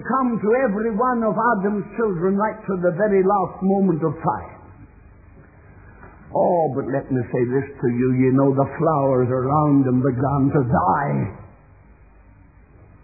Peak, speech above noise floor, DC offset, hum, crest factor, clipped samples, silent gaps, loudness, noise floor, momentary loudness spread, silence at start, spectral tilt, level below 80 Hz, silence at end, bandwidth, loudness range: -6 dBFS; 29 dB; under 0.1%; none; 16 dB; under 0.1%; none; -20 LUFS; -49 dBFS; 6 LU; 0 s; -16 dB/octave; -50 dBFS; 1.55 s; 2.6 kHz; 6 LU